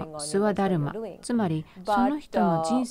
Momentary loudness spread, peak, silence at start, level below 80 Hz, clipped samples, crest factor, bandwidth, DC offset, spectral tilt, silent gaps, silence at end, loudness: 7 LU; -12 dBFS; 0 s; -54 dBFS; under 0.1%; 14 dB; 15 kHz; under 0.1%; -6 dB/octave; none; 0 s; -26 LUFS